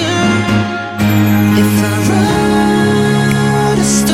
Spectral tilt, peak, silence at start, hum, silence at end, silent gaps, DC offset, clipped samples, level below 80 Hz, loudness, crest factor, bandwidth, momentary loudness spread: -5.5 dB/octave; 0 dBFS; 0 s; none; 0 s; none; under 0.1%; under 0.1%; -36 dBFS; -12 LUFS; 10 dB; 16 kHz; 3 LU